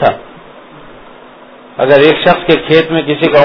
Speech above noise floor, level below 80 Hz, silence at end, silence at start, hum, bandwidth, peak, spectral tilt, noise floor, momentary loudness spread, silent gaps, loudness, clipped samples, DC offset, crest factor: 27 dB; -44 dBFS; 0 s; 0 s; none; 5.4 kHz; 0 dBFS; -7.5 dB/octave; -36 dBFS; 11 LU; none; -9 LUFS; 1%; under 0.1%; 12 dB